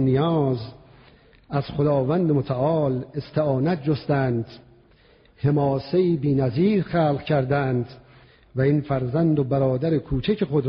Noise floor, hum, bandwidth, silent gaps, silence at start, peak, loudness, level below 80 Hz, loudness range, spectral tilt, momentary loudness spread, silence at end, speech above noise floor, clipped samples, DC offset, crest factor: -55 dBFS; none; 5.6 kHz; none; 0 s; -8 dBFS; -23 LUFS; -48 dBFS; 2 LU; -7.5 dB/octave; 8 LU; 0 s; 33 dB; under 0.1%; under 0.1%; 14 dB